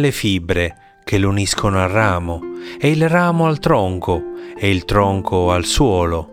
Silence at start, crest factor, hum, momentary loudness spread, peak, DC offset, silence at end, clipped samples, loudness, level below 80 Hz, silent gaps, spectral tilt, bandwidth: 0 s; 16 dB; none; 8 LU; 0 dBFS; under 0.1%; 0 s; under 0.1%; -17 LUFS; -34 dBFS; none; -5.5 dB/octave; 16 kHz